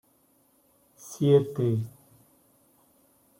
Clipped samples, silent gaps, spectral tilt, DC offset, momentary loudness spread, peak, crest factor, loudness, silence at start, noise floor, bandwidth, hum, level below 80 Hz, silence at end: under 0.1%; none; -8 dB/octave; under 0.1%; 22 LU; -10 dBFS; 20 dB; -25 LUFS; 1.05 s; -65 dBFS; 16.5 kHz; none; -70 dBFS; 1.5 s